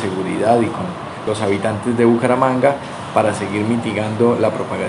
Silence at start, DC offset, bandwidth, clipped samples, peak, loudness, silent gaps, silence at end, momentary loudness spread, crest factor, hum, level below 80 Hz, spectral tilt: 0 s; under 0.1%; 11.5 kHz; under 0.1%; 0 dBFS; -18 LUFS; none; 0 s; 8 LU; 18 dB; none; -60 dBFS; -6.5 dB/octave